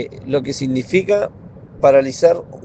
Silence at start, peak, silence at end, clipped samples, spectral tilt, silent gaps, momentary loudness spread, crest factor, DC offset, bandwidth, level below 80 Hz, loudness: 0 s; 0 dBFS; 0.05 s; under 0.1%; -6 dB/octave; none; 8 LU; 16 dB; under 0.1%; 8.6 kHz; -50 dBFS; -17 LUFS